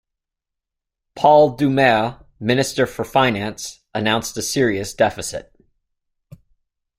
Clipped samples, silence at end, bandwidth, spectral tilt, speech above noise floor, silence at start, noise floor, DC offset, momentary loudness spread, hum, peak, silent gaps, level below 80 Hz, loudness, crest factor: under 0.1%; 1.6 s; 16 kHz; -4.5 dB/octave; 66 dB; 1.15 s; -84 dBFS; under 0.1%; 14 LU; none; -2 dBFS; none; -52 dBFS; -18 LUFS; 18 dB